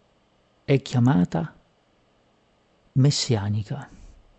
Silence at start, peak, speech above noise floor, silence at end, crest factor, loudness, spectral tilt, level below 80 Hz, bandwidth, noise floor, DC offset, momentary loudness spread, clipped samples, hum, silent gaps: 0.7 s; -8 dBFS; 41 dB; 0.3 s; 18 dB; -23 LUFS; -6 dB/octave; -56 dBFS; 8.6 kHz; -63 dBFS; under 0.1%; 16 LU; under 0.1%; none; none